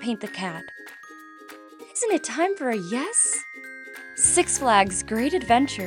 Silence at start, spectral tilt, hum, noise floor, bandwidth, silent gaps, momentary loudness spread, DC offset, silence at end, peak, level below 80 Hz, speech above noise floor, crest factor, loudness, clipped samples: 0 s; -2.5 dB/octave; none; -45 dBFS; 19.5 kHz; none; 23 LU; under 0.1%; 0 s; -4 dBFS; -54 dBFS; 22 dB; 22 dB; -22 LUFS; under 0.1%